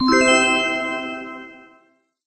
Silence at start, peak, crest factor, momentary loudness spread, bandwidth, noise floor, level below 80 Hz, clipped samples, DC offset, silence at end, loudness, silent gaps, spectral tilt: 0 s; -2 dBFS; 18 dB; 20 LU; 8.8 kHz; -59 dBFS; -52 dBFS; under 0.1%; under 0.1%; 0.7 s; -17 LUFS; none; -2 dB/octave